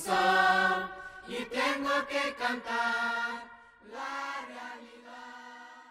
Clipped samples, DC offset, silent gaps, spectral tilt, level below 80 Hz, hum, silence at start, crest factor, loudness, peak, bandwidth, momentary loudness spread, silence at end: under 0.1%; under 0.1%; none; -3 dB/octave; -68 dBFS; none; 0 s; 18 dB; -30 LUFS; -14 dBFS; 16 kHz; 23 LU; 0 s